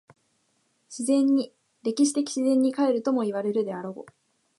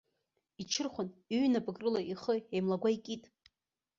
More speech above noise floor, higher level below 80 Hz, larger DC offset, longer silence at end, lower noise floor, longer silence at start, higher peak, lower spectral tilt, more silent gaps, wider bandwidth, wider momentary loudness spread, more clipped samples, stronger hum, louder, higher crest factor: second, 46 dB vs 55 dB; second, -80 dBFS vs -74 dBFS; neither; second, 0.55 s vs 0.8 s; second, -70 dBFS vs -89 dBFS; first, 0.9 s vs 0.6 s; first, -12 dBFS vs -20 dBFS; about the same, -4.5 dB/octave vs -5 dB/octave; neither; first, 11.5 kHz vs 7.6 kHz; first, 15 LU vs 11 LU; neither; neither; first, -25 LUFS vs -35 LUFS; about the same, 14 dB vs 16 dB